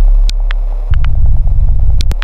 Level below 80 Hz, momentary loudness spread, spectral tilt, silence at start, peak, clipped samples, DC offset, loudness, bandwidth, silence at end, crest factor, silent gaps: -8 dBFS; 5 LU; -6 dB/octave; 0 s; 0 dBFS; under 0.1%; under 0.1%; -15 LUFS; 7.4 kHz; 0 s; 8 dB; none